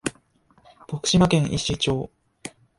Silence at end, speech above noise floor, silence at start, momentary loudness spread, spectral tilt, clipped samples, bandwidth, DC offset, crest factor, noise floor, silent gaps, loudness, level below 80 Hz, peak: 0.3 s; 38 dB; 0.05 s; 22 LU; -5 dB/octave; under 0.1%; 11.5 kHz; under 0.1%; 18 dB; -60 dBFS; none; -22 LUFS; -46 dBFS; -6 dBFS